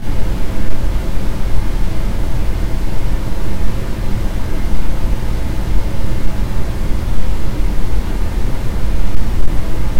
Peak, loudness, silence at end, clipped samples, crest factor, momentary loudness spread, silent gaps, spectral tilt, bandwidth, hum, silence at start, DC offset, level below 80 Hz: 0 dBFS; -22 LUFS; 0 s; 0.5%; 10 dB; 1 LU; none; -6.5 dB/octave; 14.5 kHz; none; 0 s; under 0.1%; -16 dBFS